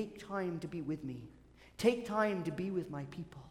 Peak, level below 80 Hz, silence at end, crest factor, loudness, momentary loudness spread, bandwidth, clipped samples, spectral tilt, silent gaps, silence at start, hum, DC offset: -16 dBFS; -66 dBFS; 0 s; 22 dB; -37 LUFS; 15 LU; 16.5 kHz; under 0.1%; -6.5 dB/octave; none; 0 s; none; under 0.1%